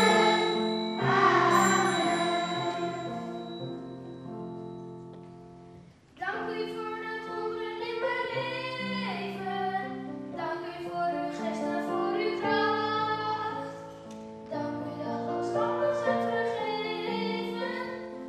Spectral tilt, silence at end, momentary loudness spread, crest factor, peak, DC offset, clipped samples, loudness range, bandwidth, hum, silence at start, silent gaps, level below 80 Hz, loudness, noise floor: -4.5 dB/octave; 0 s; 17 LU; 20 dB; -10 dBFS; under 0.1%; under 0.1%; 11 LU; 14.5 kHz; none; 0 s; none; -68 dBFS; -30 LUFS; -52 dBFS